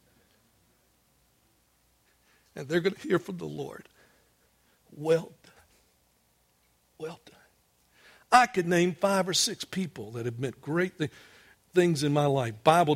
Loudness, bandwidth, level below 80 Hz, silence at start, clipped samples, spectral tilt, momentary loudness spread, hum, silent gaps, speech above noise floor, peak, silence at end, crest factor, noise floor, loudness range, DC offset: -27 LUFS; 16.5 kHz; -68 dBFS; 2.55 s; under 0.1%; -4.5 dB/octave; 19 LU; none; none; 42 dB; -6 dBFS; 0 s; 24 dB; -69 dBFS; 10 LU; under 0.1%